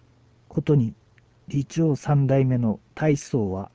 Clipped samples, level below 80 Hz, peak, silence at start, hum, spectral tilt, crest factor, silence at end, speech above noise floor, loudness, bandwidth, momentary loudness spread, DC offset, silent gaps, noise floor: under 0.1%; -52 dBFS; -8 dBFS; 0.5 s; none; -8 dB/octave; 14 dB; 0.1 s; 35 dB; -24 LUFS; 8 kHz; 9 LU; under 0.1%; none; -57 dBFS